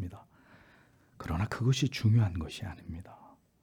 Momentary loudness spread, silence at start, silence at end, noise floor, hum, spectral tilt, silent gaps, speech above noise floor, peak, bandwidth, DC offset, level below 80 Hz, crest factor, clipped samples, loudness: 19 LU; 0 s; 0.5 s; -62 dBFS; none; -6 dB/octave; none; 32 dB; -16 dBFS; 13 kHz; under 0.1%; -54 dBFS; 16 dB; under 0.1%; -31 LUFS